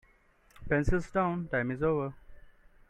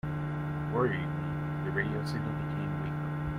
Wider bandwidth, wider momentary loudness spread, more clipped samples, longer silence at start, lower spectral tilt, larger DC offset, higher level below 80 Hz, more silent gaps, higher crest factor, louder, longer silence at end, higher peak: about the same, 10.5 kHz vs 10.5 kHz; about the same, 4 LU vs 5 LU; neither; first, 0.6 s vs 0.05 s; about the same, -8 dB/octave vs -8.5 dB/octave; neither; first, -42 dBFS vs -50 dBFS; neither; about the same, 20 dB vs 16 dB; about the same, -31 LUFS vs -33 LUFS; first, 0.4 s vs 0 s; about the same, -14 dBFS vs -16 dBFS